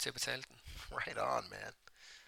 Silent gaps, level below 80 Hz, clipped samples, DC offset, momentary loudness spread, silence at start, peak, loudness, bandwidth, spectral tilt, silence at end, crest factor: none; -62 dBFS; under 0.1%; under 0.1%; 16 LU; 0 s; -20 dBFS; -40 LUFS; 17.5 kHz; -2 dB/octave; 0 s; 22 dB